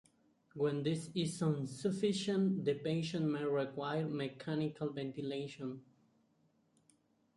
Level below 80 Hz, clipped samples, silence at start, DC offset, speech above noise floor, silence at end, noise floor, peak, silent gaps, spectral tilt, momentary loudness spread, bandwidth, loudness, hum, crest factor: -76 dBFS; under 0.1%; 0.55 s; under 0.1%; 38 dB; 1.55 s; -75 dBFS; -22 dBFS; none; -6.5 dB/octave; 8 LU; 11.5 kHz; -38 LUFS; none; 16 dB